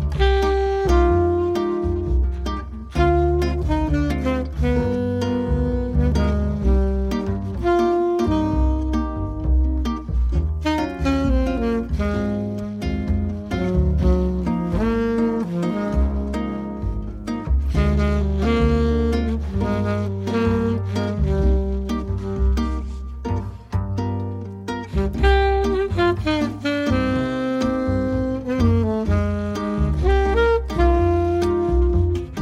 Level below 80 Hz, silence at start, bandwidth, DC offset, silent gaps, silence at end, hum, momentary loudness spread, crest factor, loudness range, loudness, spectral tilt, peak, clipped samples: -24 dBFS; 0 s; 8.2 kHz; under 0.1%; none; 0 s; none; 8 LU; 16 dB; 3 LU; -21 LUFS; -8 dB/octave; -4 dBFS; under 0.1%